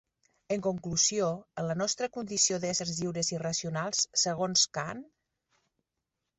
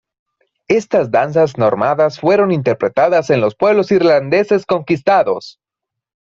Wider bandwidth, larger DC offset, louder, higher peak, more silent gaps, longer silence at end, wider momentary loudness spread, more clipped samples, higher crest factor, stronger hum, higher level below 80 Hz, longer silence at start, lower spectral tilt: first, 8.4 kHz vs 7.6 kHz; neither; second, -29 LUFS vs -14 LUFS; second, -12 dBFS vs 0 dBFS; neither; first, 1.35 s vs 0.85 s; first, 9 LU vs 4 LU; neither; first, 20 dB vs 14 dB; neither; second, -66 dBFS vs -56 dBFS; second, 0.5 s vs 0.7 s; second, -2.5 dB/octave vs -7 dB/octave